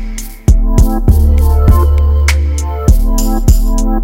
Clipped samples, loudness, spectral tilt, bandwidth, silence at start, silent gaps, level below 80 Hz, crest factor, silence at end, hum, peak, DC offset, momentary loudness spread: 2%; -12 LUFS; -6.5 dB/octave; 16.5 kHz; 0 s; none; -10 dBFS; 8 dB; 0 s; none; 0 dBFS; under 0.1%; 5 LU